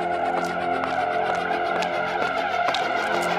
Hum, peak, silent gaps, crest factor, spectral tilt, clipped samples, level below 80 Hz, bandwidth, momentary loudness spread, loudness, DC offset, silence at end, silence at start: none; -8 dBFS; none; 16 dB; -4 dB/octave; under 0.1%; -60 dBFS; 15 kHz; 2 LU; -24 LUFS; under 0.1%; 0 s; 0 s